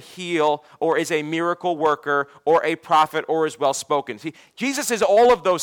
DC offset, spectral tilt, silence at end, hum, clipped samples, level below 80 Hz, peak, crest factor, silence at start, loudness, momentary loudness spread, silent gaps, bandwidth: under 0.1%; -3.5 dB/octave; 0 s; none; under 0.1%; -60 dBFS; -8 dBFS; 12 dB; 0.1 s; -21 LUFS; 9 LU; none; 17.5 kHz